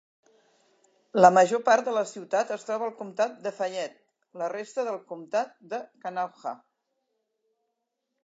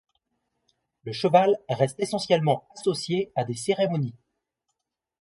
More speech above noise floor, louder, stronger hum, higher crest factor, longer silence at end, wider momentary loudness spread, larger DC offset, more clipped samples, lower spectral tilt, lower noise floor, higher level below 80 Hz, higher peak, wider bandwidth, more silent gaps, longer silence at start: about the same, 55 dB vs 57 dB; about the same, -27 LUFS vs -25 LUFS; neither; about the same, 26 dB vs 22 dB; first, 1.7 s vs 1.1 s; first, 18 LU vs 9 LU; neither; neither; about the same, -4.5 dB/octave vs -5.5 dB/octave; about the same, -81 dBFS vs -81 dBFS; second, -88 dBFS vs -68 dBFS; about the same, -2 dBFS vs -4 dBFS; second, 8 kHz vs 11.5 kHz; neither; about the same, 1.15 s vs 1.05 s